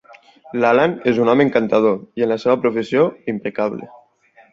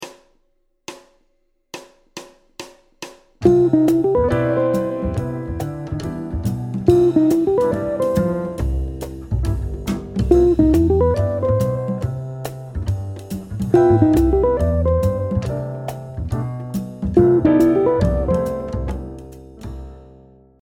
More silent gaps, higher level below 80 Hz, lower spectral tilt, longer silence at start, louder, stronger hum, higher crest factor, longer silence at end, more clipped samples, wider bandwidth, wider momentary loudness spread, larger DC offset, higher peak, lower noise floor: neither; second, -62 dBFS vs -30 dBFS; about the same, -7.5 dB/octave vs -8.5 dB/octave; first, 0.5 s vs 0 s; about the same, -17 LUFS vs -19 LUFS; neither; about the same, 16 dB vs 18 dB; first, 0.65 s vs 0.5 s; neither; second, 7.6 kHz vs 16.5 kHz; second, 9 LU vs 23 LU; neither; about the same, -2 dBFS vs 0 dBFS; second, -52 dBFS vs -64 dBFS